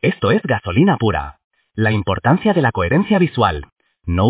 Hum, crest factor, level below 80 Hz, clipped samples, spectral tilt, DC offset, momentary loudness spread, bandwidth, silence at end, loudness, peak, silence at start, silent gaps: none; 16 dB; -34 dBFS; under 0.1%; -11 dB/octave; under 0.1%; 12 LU; 4 kHz; 0 s; -17 LUFS; 0 dBFS; 0.05 s; 1.44-1.51 s, 3.72-3.76 s